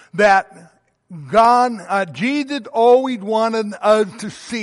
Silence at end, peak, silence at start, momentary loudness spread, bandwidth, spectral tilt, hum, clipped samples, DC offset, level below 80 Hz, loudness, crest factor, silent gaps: 0 s; -2 dBFS; 0.15 s; 10 LU; 11.5 kHz; -5 dB/octave; none; under 0.1%; under 0.1%; -58 dBFS; -16 LUFS; 14 dB; none